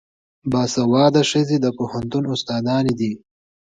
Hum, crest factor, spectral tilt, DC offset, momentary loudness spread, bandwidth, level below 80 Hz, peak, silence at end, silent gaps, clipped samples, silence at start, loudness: none; 18 dB; -5.5 dB/octave; under 0.1%; 11 LU; 9.4 kHz; -54 dBFS; -2 dBFS; 0.6 s; none; under 0.1%; 0.45 s; -19 LUFS